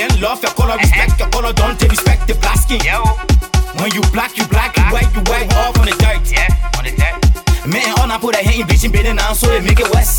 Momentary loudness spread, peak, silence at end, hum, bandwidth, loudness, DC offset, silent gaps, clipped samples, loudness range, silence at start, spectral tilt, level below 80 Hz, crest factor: 4 LU; 0 dBFS; 0 s; none; 19 kHz; -13 LUFS; under 0.1%; none; under 0.1%; 1 LU; 0 s; -4.5 dB/octave; -14 dBFS; 12 dB